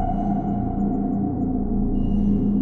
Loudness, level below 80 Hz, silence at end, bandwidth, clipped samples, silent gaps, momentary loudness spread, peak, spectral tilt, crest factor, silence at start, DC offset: -23 LUFS; -28 dBFS; 0 s; 3.1 kHz; under 0.1%; none; 3 LU; -10 dBFS; -12 dB/octave; 10 dB; 0 s; under 0.1%